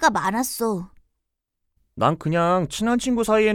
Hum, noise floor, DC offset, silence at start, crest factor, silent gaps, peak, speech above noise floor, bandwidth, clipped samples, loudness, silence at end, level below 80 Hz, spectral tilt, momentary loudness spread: none; -79 dBFS; under 0.1%; 0 s; 20 dB; none; -4 dBFS; 58 dB; 18 kHz; under 0.1%; -22 LUFS; 0 s; -50 dBFS; -5 dB/octave; 6 LU